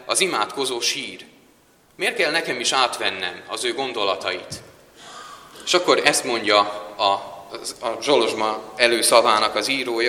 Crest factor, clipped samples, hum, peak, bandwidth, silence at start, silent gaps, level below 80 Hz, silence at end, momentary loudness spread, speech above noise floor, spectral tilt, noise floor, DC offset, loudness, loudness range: 22 dB; under 0.1%; none; 0 dBFS; 16 kHz; 0 s; none; -64 dBFS; 0 s; 18 LU; 35 dB; -1.5 dB/octave; -56 dBFS; under 0.1%; -20 LUFS; 4 LU